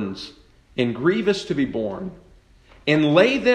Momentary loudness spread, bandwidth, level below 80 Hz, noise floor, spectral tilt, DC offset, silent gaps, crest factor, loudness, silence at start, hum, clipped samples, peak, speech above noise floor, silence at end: 18 LU; 9.6 kHz; -52 dBFS; -51 dBFS; -6 dB/octave; under 0.1%; none; 18 dB; -21 LUFS; 0 s; none; under 0.1%; -2 dBFS; 32 dB; 0 s